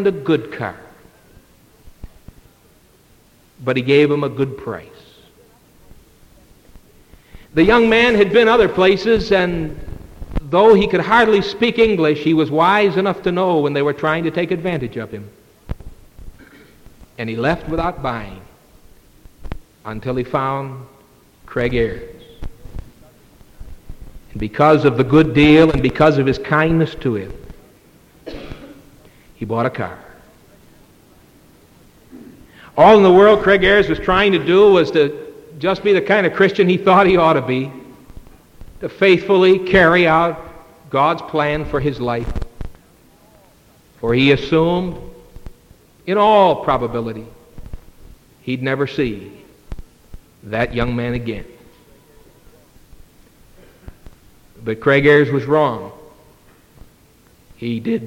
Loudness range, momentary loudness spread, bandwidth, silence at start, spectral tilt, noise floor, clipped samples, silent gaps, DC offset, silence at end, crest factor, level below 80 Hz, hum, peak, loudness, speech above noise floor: 13 LU; 22 LU; 15.5 kHz; 0 s; -7 dB/octave; -51 dBFS; under 0.1%; none; under 0.1%; 0 s; 18 dB; -38 dBFS; none; 0 dBFS; -15 LUFS; 37 dB